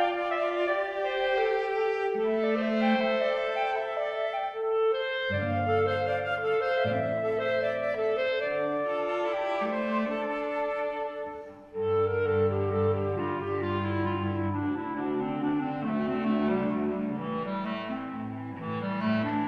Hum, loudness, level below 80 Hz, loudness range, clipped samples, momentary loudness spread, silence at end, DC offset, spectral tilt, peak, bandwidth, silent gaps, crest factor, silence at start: none; -29 LUFS; -62 dBFS; 3 LU; under 0.1%; 6 LU; 0 s; under 0.1%; -8 dB/octave; -14 dBFS; 7.4 kHz; none; 16 dB; 0 s